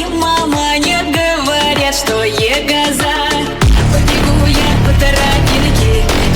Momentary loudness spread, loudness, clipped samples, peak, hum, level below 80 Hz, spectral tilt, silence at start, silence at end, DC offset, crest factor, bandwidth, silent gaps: 2 LU; -12 LUFS; under 0.1%; 0 dBFS; none; -18 dBFS; -4.5 dB/octave; 0 s; 0 s; under 0.1%; 12 dB; over 20 kHz; none